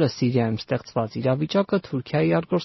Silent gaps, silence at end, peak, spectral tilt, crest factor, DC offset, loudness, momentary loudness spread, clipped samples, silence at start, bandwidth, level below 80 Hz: none; 0 s; -8 dBFS; -6.5 dB/octave; 14 dB; under 0.1%; -24 LUFS; 5 LU; under 0.1%; 0 s; 6.2 kHz; -58 dBFS